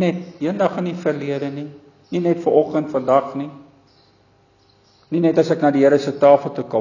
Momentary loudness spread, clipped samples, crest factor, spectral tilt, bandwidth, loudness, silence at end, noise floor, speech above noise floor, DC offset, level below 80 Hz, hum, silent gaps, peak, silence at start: 14 LU; under 0.1%; 18 dB; -7.5 dB/octave; 7.2 kHz; -18 LUFS; 0 s; -56 dBFS; 38 dB; under 0.1%; -66 dBFS; none; none; -2 dBFS; 0 s